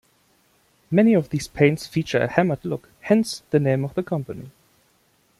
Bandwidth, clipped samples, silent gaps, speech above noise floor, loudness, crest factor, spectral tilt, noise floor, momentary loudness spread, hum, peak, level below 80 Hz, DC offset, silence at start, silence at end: 14 kHz; under 0.1%; none; 41 dB; -22 LUFS; 20 dB; -6.5 dB/octave; -63 dBFS; 11 LU; none; -4 dBFS; -56 dBFS; under 0.1%; 0.9 s; 0.9 s